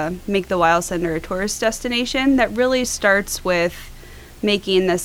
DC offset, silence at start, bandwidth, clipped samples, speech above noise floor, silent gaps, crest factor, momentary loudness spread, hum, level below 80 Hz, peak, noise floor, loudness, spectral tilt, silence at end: under 0.1%; 0 s; 18.5 kHz; under 0.1%; 20 dB; none; 16 dB; 7 LU; none; -40 dBFS; -4 dBFS; -39 dBFS; -19 LUFS; -3.5 dB/octave; 0 s